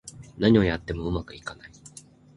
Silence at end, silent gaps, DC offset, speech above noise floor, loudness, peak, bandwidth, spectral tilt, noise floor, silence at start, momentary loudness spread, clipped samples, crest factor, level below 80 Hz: 0.5 s; none; under 0.1%; 25 dB; -24 LUFS; -6 dBFS; 11.5 kHz; -6.5 dB/octave; -50 dBFS; 0.05 s; 25 LU; under 0.1%; 20 dB; -42 dBFS